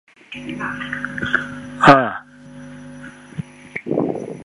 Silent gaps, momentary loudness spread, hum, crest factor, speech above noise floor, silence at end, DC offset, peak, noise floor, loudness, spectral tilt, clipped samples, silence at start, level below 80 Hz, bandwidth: none; 25 LU; 50 Hz at -45 dBFS; 20 dB; 22 dB; 0 s; under 0.1%; 0 dBFS; -39 dBFS; -18 LUFS; -6 dB/octave; under 0.1%; 0.3 s; -52 dBFS; 11 kHz